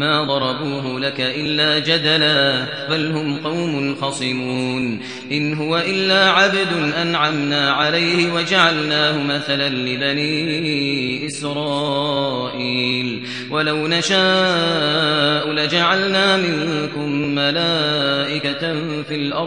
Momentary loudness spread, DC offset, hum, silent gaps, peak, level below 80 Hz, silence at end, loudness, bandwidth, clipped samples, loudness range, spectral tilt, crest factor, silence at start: 8 LU; 0.2%; none; none; 0 dBFS; -64 dBFS; 0 s; -18 LUFS; 10.5 kHz; under 0.1%; 4 LU; -4.5 dB/octave; 18 dB; 0 s